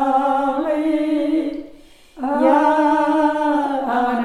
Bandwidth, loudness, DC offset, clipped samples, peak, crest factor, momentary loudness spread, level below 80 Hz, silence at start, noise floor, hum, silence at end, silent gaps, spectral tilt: 11.5 kHz; -18 LUFS; under 0.1%; under 0.1%; -4 dBFS; 14 dB; 8 LU; -52 dBFS; 0 s; -44 dBFS; none; 0 s; none; -5 dB/octave